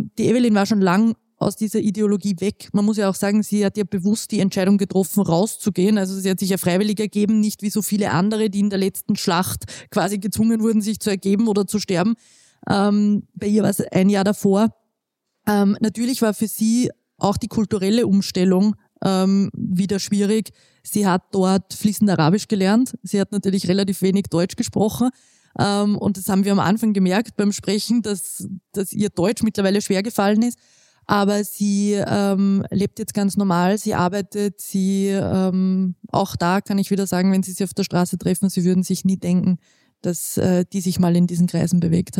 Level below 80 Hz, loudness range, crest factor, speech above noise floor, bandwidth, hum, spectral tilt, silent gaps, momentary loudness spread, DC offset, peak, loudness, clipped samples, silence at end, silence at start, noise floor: -54 dBFS; 1 LU; 18 dB; 58 dB; 16.5 kHz; none; -6 dB/octave; none; 6 LU; under 0.1%; -2 dBFS; -20 LUFS; under 0.1%; 0 s; 0 s; -77 dBFS